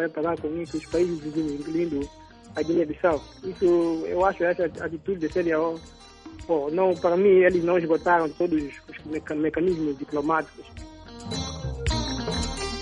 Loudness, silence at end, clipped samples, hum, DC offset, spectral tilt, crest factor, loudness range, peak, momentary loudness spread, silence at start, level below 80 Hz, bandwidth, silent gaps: -25 LUFS; 0 s; under 0.1%; none; under 0.1%; -6 dB/octave; 18 dB; 6 LU; -8 dBFS; 15 LU; 0 s; -42 dBFS; 11 kHz; none